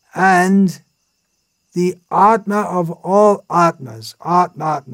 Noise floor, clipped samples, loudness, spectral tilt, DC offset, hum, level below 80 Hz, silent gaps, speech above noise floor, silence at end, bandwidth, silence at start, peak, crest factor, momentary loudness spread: -67 dBFS; under 0.1%; -15 LUFS; -6.5 dB/octave; under 0.1%; none; -66 dBFS; none; 52 dB; 0 s; 16 kHz; 0.15 s; -2 dBFS; 14 dB; 15 LU